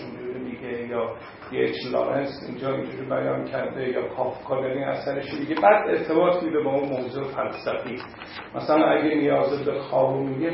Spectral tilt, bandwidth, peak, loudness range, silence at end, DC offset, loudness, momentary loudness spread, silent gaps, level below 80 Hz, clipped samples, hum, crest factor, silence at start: -10.5 dB/octave; 5.8 kHz; -4 dBFS; 4 LU; 0 s; under 0.1%; -25 LUFS; 12 LU; none; -60 dBFS; under 0.1%; none; 22 dB; 0 s